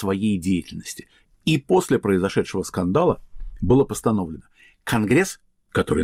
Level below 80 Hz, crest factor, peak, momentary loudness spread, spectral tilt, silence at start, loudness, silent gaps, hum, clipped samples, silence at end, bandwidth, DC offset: -42 dBFS; 14 dB; -8 dBFS; 15 LU; -6 dB/octave; 0 s; -22 LUFS; none; none; under 0.1%; 0 s; 16 kHz; under 0.1%